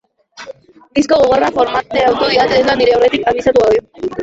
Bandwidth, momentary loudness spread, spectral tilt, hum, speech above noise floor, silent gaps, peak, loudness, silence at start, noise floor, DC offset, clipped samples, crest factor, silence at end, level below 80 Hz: 8 kHz; 11 LU; -4.5 dB/octave; none; 24 dB; none; -2 dBFS; -12 LUFS; 0.4 s; -36 dBFS; under 0.1%; under 0.1%; 12 dB; 0 s; -42 dBFS